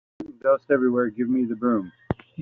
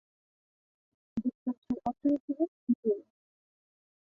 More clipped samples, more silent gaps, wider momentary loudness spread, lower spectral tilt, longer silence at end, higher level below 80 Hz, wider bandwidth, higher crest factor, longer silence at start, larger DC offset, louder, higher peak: neither; second, none vs 1.35-1.46 s, 1.58-1.62 s, 2.20-2.28 s, 2.48-2.67 s, 2.75-2.83 s; first, 12 LU vs 6 LU; second, -8 dB/octave vs -10 dB/octave; second, 0 s vs 1.15 s; first, -56 dBFS vs -68 dBFS; second, 3.7 kHz vs 4.1 kHz; about the same, 16 dB vs 18 dB; second, 0.2 s vs 1.15 s; neither; first, -24 LUFS vs -33 LUFS; first, -8 dBFS vs -18 dBFS